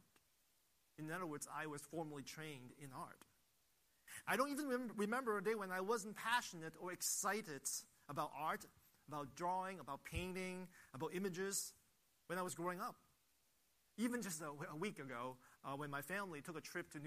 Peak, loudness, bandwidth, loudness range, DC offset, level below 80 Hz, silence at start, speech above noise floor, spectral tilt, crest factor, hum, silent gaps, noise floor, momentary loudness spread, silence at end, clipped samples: -24 dBFS; -45 LUFS; 15 kHz; 7 LU; under 0.1%; -70 dBFS; 1 s; 34 dB; -3.5 dB/octave; 22 dB; none; none; -80 dBFS; 12 LU; 0 s; under 0.1%